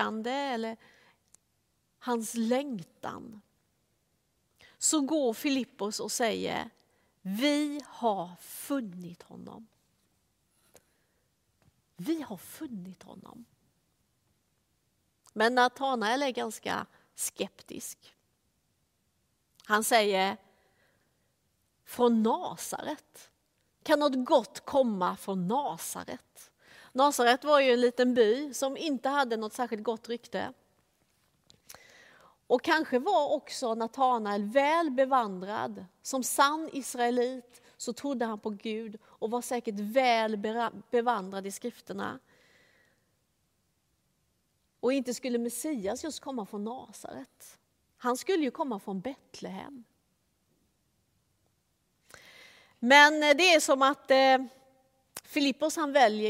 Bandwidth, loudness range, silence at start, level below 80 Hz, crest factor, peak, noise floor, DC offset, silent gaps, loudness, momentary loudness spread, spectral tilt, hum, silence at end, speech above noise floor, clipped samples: 16 kHz; 17 LU; 0 s; -76 dBFS; 26 dB; -4 dBFS; -75 dBFS; under 0.1%; none; -29 LUFS; 18 LU; -3 dB/octave; none; 0 s; 46 dB; under 0.1%